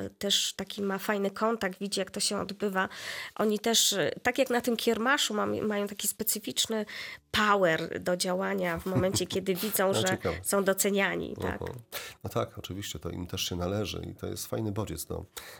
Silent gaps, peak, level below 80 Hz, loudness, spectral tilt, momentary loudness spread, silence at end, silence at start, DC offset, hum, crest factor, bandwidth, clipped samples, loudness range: none; -12 dBFS; -60 dBFS; -29 LUFS; -3 dB/octave; 12 LU; 0 s; 0 s; under 0.1%; none; 18 dB; 18 kHz; under 0.1%; 7 LU